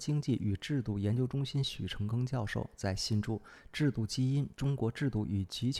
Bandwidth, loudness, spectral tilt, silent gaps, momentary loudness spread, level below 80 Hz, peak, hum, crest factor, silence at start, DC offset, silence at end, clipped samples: 13.5 kHz; -34 LUFS; -6 dB/octave; none; 5 LU; -54 dBFS; -20 dBFS; none; 14 dB; 0 s; under 0.1%; 0 s; under 0.1%